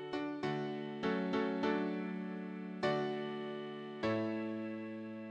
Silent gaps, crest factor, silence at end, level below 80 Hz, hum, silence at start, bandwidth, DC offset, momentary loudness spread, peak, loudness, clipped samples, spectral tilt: none; 16 dB; 0 s; -76 dBFS; none; 0 s; 9.2 kHz; under 0.1%; 9 LU; -22 dBFS; -39 LUFS; under 0.1%; -7 dB/octave